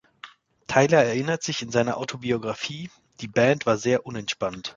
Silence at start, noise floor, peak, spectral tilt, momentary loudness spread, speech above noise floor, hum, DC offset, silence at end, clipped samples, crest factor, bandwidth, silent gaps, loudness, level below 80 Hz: 0.25 s; -48 dBFS; -2 dBFS; -4.5 dB/octave; 13 LU; 24 dB; none; under 0.1%; 0.05 s; under 0.1%; 22 dB; 7.8 kHz; none; -24 LUFS; -60 dBFS